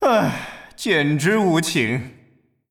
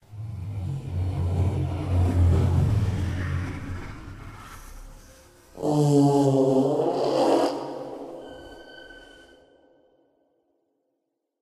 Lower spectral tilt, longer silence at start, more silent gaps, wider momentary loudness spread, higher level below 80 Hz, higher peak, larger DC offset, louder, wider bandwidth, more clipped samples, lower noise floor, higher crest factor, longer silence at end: second, -5 dB/octave vs -8 dB/octave; about the same, 0 s vs 0.1 s; neither; second, 13 LU vs 23 LU; second, -58 dBFS vs -40 dBFS; about the same, -6 dBFS vs -8 dBFS; neither; first, -20 LUFS vs -24 LUFS; first, 18 kHz vs 12.5 kHz; neither; second, -57 dBFS vs -79 dBFS; about the same, 14 dB vs 18 dB; second, 0.6 s vs 2.35 s